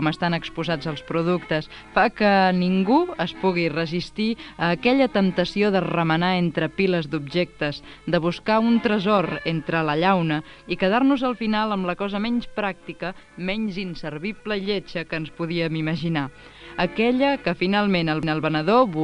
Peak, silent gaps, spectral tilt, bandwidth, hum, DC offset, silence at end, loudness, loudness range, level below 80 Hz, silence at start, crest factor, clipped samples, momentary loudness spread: -6 dBFS; none; -7.5 dB/octave; 10 kHz; none; under 0.1%; 0 s; -23 LUFS; 6 LU; -50 dBFS; 0 s; 16 dB; under 0.1%; 9 LU